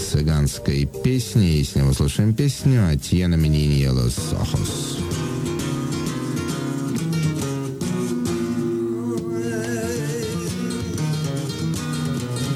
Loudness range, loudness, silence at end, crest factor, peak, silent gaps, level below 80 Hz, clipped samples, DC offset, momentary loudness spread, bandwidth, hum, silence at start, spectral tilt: 5 LU; -22 LUFS; 0 s; 16 dB; -6 dBFS; none; -34 dBFS; under 0.1%; under 0.1%; 7 LU; 16 kHz; none; 0 s; -6 dB/octave